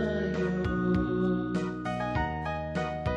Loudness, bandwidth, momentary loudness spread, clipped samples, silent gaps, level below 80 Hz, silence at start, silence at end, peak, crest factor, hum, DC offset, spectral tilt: -30 LUFS; 8.8 kHz; 5 LU; under 0.1%; none; -42 dBFS; 0 s; 0 s; -16 dBFS; 12 dB; none; under 0.1%; -8 dB/octave